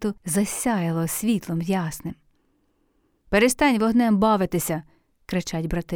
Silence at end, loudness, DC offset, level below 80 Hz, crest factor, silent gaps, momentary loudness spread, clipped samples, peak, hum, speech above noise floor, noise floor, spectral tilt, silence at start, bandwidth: 0 s; -23 LUFS; under 0.1%; -46 dBFS; 18 dB; none; 10 LU; under 0.1%; -6 dBFS; none; 44 dB; -67 dBFS; -5 dB/octave; 0 s; over 20 kHz